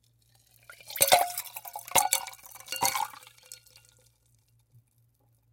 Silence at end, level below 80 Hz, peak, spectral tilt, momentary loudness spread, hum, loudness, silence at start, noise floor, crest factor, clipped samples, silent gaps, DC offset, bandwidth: 1.95 s; -68 dBFS; -4 dBFS; 0.5 dB/octave; 27 LU; none; -27 LUFS; 0.7 s; -68 dBFS; 28 dB; under 0.1%; none; under 0.1%; 17 kHz